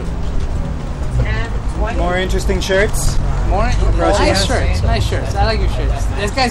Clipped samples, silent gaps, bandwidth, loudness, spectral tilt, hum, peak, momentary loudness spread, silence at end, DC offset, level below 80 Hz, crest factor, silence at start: under 0.1%; none; 14 kHz; -17 LUFS; -5 dB/octave; none; -4 dBFS; 9 LU; 0 s; under 0.1%; -18 dBFS; 12 dB; 0 s